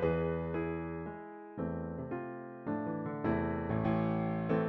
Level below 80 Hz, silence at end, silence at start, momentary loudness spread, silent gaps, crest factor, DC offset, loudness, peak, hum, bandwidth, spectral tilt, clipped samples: -54 dBFS; 0 s; 0 s; 10 LU; none; 16 dB; under 0.1%; -36 LUFS; -18 dBFS; none; 4.7 kHz; -8 dB/octave; under 0.1%